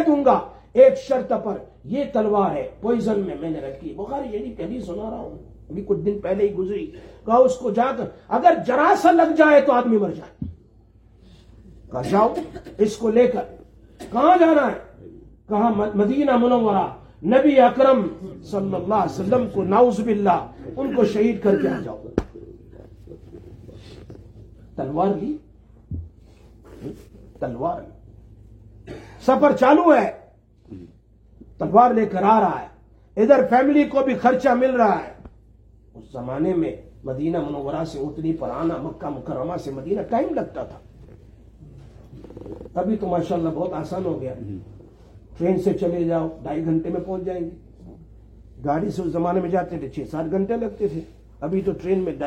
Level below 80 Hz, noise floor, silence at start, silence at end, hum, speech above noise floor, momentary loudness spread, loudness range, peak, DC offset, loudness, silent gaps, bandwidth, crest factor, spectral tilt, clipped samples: -48 dBFS; -52 dBFS; 0 s; 0 s; none; 32 dB; 19 LU; 11 LU; -2 dBFS; under 0.1%; -21 LUFS; none; 10.5 kHz; 20 dB; -7.5 dB/octave; under 0.1%